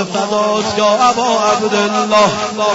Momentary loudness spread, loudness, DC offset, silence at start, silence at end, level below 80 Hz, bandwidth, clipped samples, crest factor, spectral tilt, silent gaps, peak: 4 LU; -13 LUFS; under 0.1%; 0 s; 0 s; -52 dBFS; 8 kHz; under 0.1%; 12 dB; -3.5 dB/octave; none; -2 dBFS